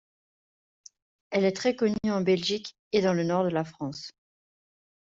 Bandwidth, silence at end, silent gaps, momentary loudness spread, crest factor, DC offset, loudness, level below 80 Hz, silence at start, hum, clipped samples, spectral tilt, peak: 7.8 kHz; 0.9 s; 2.79-2.91 s; 11 LU; 20 dB; under 0.1%; -27 LUFS; -66 dBFS; 1.3 s; none; under 0.1%; -5.5 dB/octave; -10 dBFS